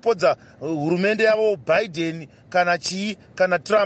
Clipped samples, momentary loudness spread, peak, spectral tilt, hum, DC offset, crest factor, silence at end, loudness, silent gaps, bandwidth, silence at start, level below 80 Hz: under 0.1%; 10 LU; -6 dBFS; -5 dB/octave; none; under 0.1%; 14 dB; 0 s; -22 LUFS; none; 8.8 kHz; 0.05 s; -64 dBFS